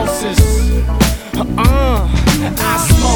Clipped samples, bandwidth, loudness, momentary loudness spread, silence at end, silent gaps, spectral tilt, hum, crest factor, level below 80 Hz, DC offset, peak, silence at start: 0.2%; 19.5 kHz; -14 LUFS; 3 LU; 0 s; none; -5 dB/octave; none; 12 dB; -16 dBFS; under 0.1%; 0 dBFS; 0 s